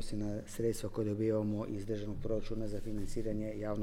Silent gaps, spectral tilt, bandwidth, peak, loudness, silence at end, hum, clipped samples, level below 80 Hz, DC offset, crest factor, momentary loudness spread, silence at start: none; -7 dB/octave; 15 kHz; -22 dBFS; -38 LUFS; 0 s; none; under 0.1%; -46 dBFS; under 0.1%; 14 dB; 7 LU; 0 s